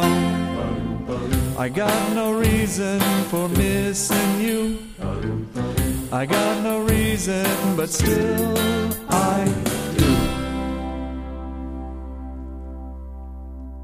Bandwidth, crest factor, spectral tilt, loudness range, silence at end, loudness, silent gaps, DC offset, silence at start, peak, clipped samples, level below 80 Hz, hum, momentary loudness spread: 15.5 kHz; 18 dB; -5 dB/octave; 5 LU; 0 s; -22 LUFS; none; under 0.1%; 0 s; -4 dBFS; under 0.1%; -34 dBFS; none; 15 LU